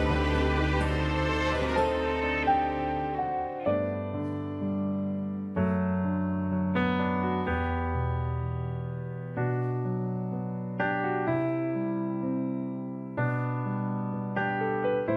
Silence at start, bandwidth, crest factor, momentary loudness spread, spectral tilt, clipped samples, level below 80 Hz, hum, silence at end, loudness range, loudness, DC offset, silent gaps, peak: 0 s; 11 kHz; 14 dB; 7 LU; -8 dB/octave; under 0.1%; -40 dBFS; none; 0 s; 3 LU; -29 LUFS; under 0.1%; none; -14 dBFS